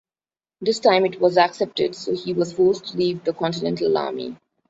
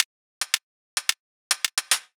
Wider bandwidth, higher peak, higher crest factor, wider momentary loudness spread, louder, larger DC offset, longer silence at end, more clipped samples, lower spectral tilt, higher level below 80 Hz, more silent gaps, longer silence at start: second, 8 kHz vs over 20 kHz; about the same, -2 dBFS vs -4 dBFS; second, 18 dB vs 26 dB; about the same, 9 LU vs 8 LU; first, -21 LUFS vs -26 LUFS; neither; first, 0.35 s vs 0.15 s; neither; first, -5.5 dB/octave vs 5 dB/octave; first, -62 dBFS vs under -90 dBFS; second, none vs 0.05-0.41 s, 0.63-0.97 s, 1.20-1.50 s; first, 0.6 s vs 0 s